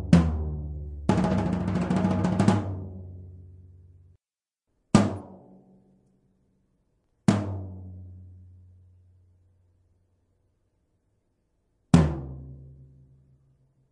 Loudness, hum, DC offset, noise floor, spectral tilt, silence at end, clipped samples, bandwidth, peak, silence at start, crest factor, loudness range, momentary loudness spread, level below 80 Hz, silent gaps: -26 LUFS; none; under 0.1%; under -90 dBFS; -7.5 dB/octave; 1.2 s; under 0.1%; 11 kHz; -2 dBFS; 0 s; 26 dB; 7 LU; 24 LU; -44 dBFS; none